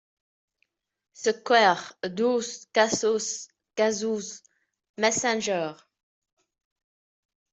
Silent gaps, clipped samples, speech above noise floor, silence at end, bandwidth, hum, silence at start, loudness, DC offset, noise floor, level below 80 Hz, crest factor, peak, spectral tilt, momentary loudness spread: 4.89-4.94 s; under 0.1%; 50 dB; 1.8 s; 8.2 kHz; none; 1.2 s; -25 LUFS; under 0.1%; -75 dBFS; -74 dBFS; 22 dB; -6 dBFS; -2.5 dB/octave; 14 LU